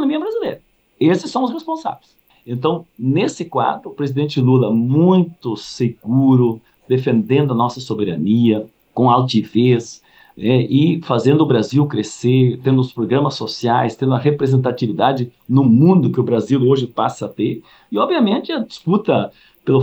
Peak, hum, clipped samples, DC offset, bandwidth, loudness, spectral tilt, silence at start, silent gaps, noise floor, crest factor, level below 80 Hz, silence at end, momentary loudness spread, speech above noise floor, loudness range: -2 dBFS; none; under 0.1%; under 0.1%; 8.4 kHz; -17 LUFS; -7.5 dB/octave; 0 s; none; -38 dBFS; 14 dB; -62 dBFS; 0 s; 10 LU; 22 dB; 4 LU